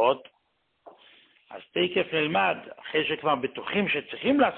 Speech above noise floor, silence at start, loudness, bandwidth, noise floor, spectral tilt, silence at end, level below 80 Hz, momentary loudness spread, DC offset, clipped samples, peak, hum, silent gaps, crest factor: 46 dB; 0 s; -27 LUFS; 4.4 kHz; -73 dBFS; -9 dB/octave; 0 s; -66 dBFS; 10 LU; under 0.1%; under 0.1%; -8 dBFS; none; none; 18 dB